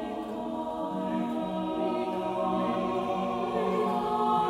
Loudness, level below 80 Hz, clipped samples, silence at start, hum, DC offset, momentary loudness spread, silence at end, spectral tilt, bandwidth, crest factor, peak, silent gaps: -30 LUFS; -60 dBFS; under 0.1%; 0 s; none; under 0.1%; 6 LU; 0 s; -7 dB/octave; 15.5 kHz; 14 dB; -14 dBFS; none